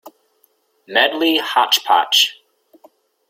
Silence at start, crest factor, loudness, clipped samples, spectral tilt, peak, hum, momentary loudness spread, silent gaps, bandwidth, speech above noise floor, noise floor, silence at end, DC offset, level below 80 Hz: 0.05 s; 18 dB; -15 LUFS; under 0.1%; 0 dB/octave; 0 dBFS; none; 4 LU; none; 16.5 kHz; 45 dB; -61 dBFS; 1 s; under 0.1%; -72 dBFS